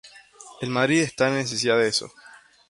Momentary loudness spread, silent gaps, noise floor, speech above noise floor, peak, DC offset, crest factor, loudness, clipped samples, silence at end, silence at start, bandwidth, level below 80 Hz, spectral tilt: 9 LU; none; -47 dBFS; 25 dB; -6 dBFS; under 0.1%; 18 dB; -22 LUFS; under 0.1%; 0.4 s; 0.05 s; 11.5 kHz; -64 dBFS; -4 dB/octave